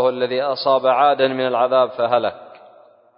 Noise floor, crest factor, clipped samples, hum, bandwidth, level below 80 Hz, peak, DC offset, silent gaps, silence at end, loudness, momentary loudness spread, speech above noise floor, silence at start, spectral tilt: -49 dBFS; 16 dB; under 0.1%; none; 5.4 kHz; -70 dBFS; -4 dBFS; under 0.1%; none; 0.7 s; -18 LUFS; 5 LU; 32 dB; 0 s; -9.5 dB/octave